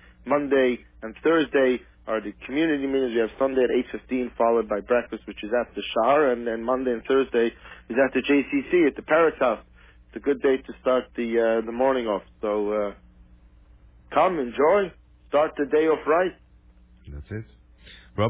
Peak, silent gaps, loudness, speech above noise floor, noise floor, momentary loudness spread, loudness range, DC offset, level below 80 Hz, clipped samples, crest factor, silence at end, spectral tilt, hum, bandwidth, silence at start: -8 dBFS; none; -24 LUFS; 30 dB; -53 dBFS; 10 LU; 3 LU; under 0.1%; -52 dBFS; under 0.1%; 16 dB; 0 s; -9.5 dB/octave; none; 4 kHz; 0.25 s